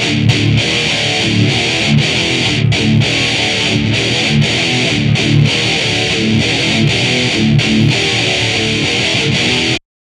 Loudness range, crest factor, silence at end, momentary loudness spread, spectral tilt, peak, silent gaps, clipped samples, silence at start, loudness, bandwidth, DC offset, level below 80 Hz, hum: 0 LU; 12 dB; 0.3 s; 1 LU; -4 dB/octave; 0 dBFS; none; under 0.1%; 0 s; -12 LUFS; 12 kHz; under 0.1%; -36 dBFS; none